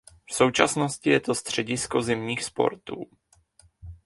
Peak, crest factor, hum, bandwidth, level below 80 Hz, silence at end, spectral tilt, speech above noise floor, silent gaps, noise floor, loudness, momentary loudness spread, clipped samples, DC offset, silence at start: 0 dBFS; 26 dB; none; 11.5 kHz; -56 dBFS; 0.1 s; -4 dB/octave; 35 dB; none; -60 dBFS; -25 LUFS; 16 LU; under 0.1%; under 0.1%; 0.3 s